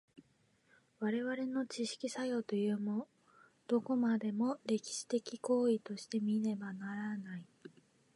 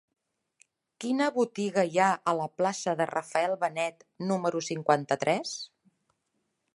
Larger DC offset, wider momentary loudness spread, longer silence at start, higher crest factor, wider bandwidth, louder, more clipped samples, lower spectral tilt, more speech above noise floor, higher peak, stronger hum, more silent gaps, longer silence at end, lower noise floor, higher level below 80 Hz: neither; about the same, 9 LU vs 9 LU; second, 0.15 s vs 1 s; second, 16 dB vs 22 dB; about the same, 11.5 kHz vs 11.5 kHz; second, -37 LUFS vs -29 LUFS; neither; about the same, -5.5 dB/octave vs -4.5 dB/octave; second, 36 dB vs 50 dB; second, -22 dBFS vs -8 dBFS; neither; neither; second, 0.45 s vs 1.1 s; second, -73 dBFS vs -79 dBFS; second, -88 dBFS vs -82 dBFS